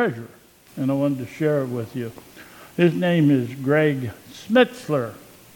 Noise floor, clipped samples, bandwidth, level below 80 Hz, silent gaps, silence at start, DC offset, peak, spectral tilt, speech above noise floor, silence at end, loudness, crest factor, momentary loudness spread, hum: -44 dBFS; under 0.1%; 19 kHz; -64 dBFS; none; 0 s; under 0.1%; -4 dBFS; -7 dB/octave; 23 dB; 0.4 s; -22 LUFS; 18 dB; 17 LU; none